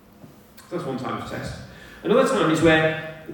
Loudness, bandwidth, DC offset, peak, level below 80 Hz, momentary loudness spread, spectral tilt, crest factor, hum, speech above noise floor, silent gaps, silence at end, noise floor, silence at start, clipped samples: -22 LUFS; 18 kHz; under 0.1%; -6 dBFS; -48 dBFS; 17 LU; -5.5 dB/octave; 18 dB; none; 27 dB; none; 0 s; -48 dBFS; 0.25 s; under 0.1%